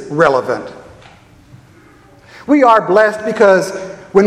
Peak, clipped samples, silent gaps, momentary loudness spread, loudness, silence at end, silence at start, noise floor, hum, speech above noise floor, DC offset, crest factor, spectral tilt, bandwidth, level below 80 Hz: 0 dBFS; 0.1%; none; 16 LU; -12 LUFS; 0 s; 0 s; -44 dBFS; none; 32 dB; under 0.1%; 14 dB; -5.5 dB/octave; 14 kHz; -52 dBFS